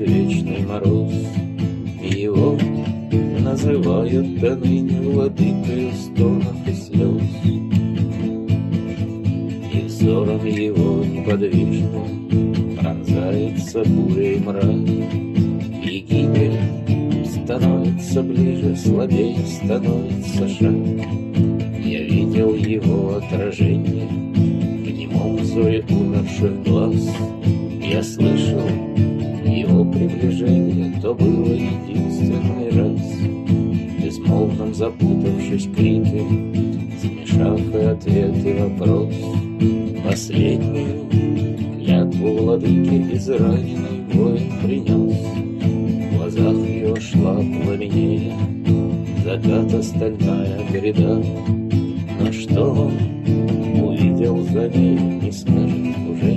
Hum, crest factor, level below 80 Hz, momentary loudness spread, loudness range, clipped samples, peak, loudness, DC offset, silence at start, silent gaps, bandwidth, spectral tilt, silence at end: none; 16 dB; -48 dBFS; 6 LU; 2 LU; under 0.1%; -2 dBFS; -19 LUFS; under 0.1%; 0 s; none; 12 kHz; -8 dB/octave; 0 s